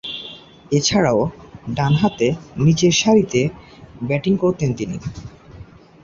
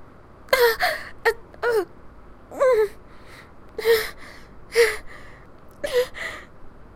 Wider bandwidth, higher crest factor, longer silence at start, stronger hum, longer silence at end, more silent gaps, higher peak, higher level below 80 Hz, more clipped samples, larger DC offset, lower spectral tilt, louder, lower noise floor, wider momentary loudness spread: second, 7.6 kHz vs 16 kHz; second, 16 dB vs 22 dB; about the same, 0.05 s vs 0 s; neither; first, 0.4 s vs 0.15 s; neither; about the same, -2 dBFS vs -2 dBFS; about the same, -46 dBFS vs -48 dBFS; neither; neither; first, -5 dB/octave vs -2 dB/octave; first, -18 LUFS vs -23 LUFS; second, -41 dBFS vs -45 dBFS; second, 16 LU vs 21 LU